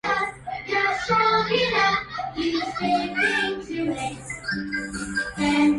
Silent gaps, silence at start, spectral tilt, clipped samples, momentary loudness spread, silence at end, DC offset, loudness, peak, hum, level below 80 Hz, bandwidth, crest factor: none; 0.05 s; -4 dB/octave; under 0.1%; 9 LU; 0 s; under 0.1%; -24 LUFS; -8 dBFS; none; -50 dBFS; 11.5 kHz; 16 dB